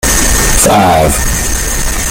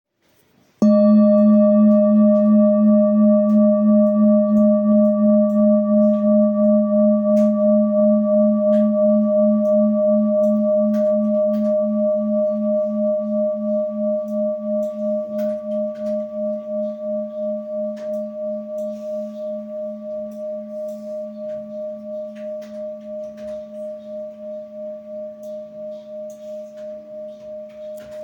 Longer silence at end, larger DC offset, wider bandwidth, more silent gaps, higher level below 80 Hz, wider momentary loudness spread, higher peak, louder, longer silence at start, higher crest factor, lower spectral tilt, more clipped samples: about the same, 0 s vs 0 s; neither; first, over 20 kHz vs 2.6 kHz; neither; first, -16 dBFS vs -68 dBFS; second, 7 LU vs 19 LU; first, 0 dBFS vs -6 dBFS; first, -9 LUFS vs -17 LUFS; second, 0 s vs 0.8 s; about the same, 10 dB vs 12 dB; second, -3 dB/octave vs -11 dB/octave; neither